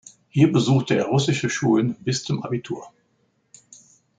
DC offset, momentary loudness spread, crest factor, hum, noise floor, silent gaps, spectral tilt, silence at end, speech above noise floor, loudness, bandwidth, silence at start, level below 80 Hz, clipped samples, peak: under 0.1%; 10 LU; 18 dB; none; -67 dBFS; none; -6 dB/octave; 1.3 s; 46 dB; -21 LUFS; 9.4 kHz; 0.35 s; -60 dBFS; under 0.1%; -4 dBFS